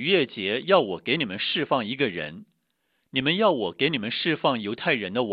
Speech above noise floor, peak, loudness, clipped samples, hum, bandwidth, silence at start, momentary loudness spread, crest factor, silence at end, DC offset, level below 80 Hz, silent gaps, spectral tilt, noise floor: 49 dB; -4 dBFS; -24 LUFS; under 0.1%; none; 5.2 kHz; 0 s; 6 LU; 20 dB; 0 s; under 0.1%; -66 dBFS; none; -8.5 dB/octave; -74 dBFS